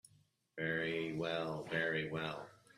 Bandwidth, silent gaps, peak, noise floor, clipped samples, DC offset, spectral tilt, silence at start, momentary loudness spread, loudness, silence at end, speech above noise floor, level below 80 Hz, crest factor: 13.5 kHz; none; -22 dBFS; -72 dBFS; under 0.1%; under 0.1%; -6 dB/octave; 0.55 s; 7 LU; -39 LUFS; 0.2 s; 33 dB; -74 dBFS; 18 dB